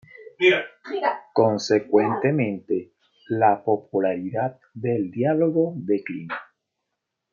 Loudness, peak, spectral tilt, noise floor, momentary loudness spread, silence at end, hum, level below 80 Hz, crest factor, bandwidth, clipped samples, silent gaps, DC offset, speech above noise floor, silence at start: -23 LUFS; -6 dBFS; -6.5 dB/octave; -81 dBFS; 11 LU; 0.9 s; none; -72 dBFS; 18 dB; 7.4 kHz; under 0.1%; none; under 0.1%; 59 dB; 0.2 s